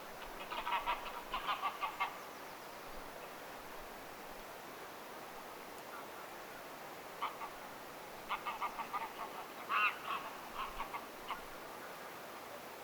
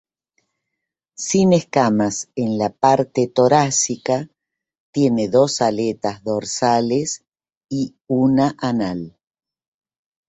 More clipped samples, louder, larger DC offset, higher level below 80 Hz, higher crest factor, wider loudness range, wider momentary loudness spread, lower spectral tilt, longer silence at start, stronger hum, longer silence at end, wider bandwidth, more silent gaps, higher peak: neither; second, -43 LUFS vs -19 LUFS; neither; second, -64 dBFS vs -58 dBFS; first, 24 dB vs 18 dB; first, 9 LU vs 3 LU; about the same, 11 LU vs 11 LU; second, -2 dB/octave vs -5 dB/octave; second, 0 s vs 1.2 s; neither; second, 0 s vs 1.2 s; first, over 20 kHz vs 8.4 kHz; second, none vs 4.80-4.93 s, 7.28-7.32 s, 7.57-7.61 s; second, -20 dBFS vs -2 dBFS